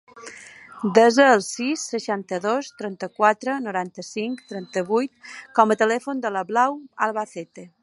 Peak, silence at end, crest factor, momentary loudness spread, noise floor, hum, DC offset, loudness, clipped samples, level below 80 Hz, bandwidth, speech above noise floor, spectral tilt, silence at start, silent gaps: 0 dBFS; 0.15 s; 22 dB; 19 LU; -43 dBFS; none; under 0.1%; -22 LUFS; under 0.1%; -76 dBFS; 11.5 kHz; 21 dB; -4 dB/octave; 0.15 s; none